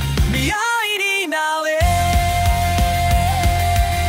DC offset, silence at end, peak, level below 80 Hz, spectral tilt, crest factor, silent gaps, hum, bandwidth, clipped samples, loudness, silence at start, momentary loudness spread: under 0.1%; 0 s; -6 dBFS; -22 dBFS; -4.5 dB/octave; 12 dB; none; none; 16 kHz; under 0.1%; -17 LUFS; 0 s; 2 LU